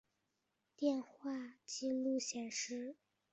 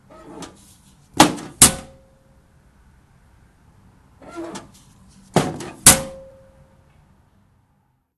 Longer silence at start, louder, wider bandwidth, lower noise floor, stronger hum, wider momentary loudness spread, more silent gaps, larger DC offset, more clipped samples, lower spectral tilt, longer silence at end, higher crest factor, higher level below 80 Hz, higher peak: first, 0.8 s vs 0.35 s; second, -41 LUFS vs -15 LUFS; second, 8.2 kHz vs 16 kHz; first, -86 dBFS vs -64 dBFS; neither; second, 9 LU vs 27 LU; neither; neither; neither; about the same, -2 dB/octave vs -2 dB/octave; second, 0.4 s vs 2 s; second, 18 dB vs 24 dB; second, -88 dBFS vs -44 dBFS; second, -24 dBFS vs 0 dBFS